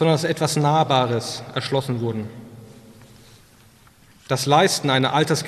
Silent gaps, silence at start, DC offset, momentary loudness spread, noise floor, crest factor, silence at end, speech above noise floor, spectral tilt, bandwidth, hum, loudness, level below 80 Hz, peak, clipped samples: none; 0 s; under 0.1%; 11 LU; -52 dBFS; 18 dB; 0 s; 32 dB; -4.5 dB/octave; 14 kHz; none; -20 LUFS; -58 dBFS; -4 dBFS; under 0.1%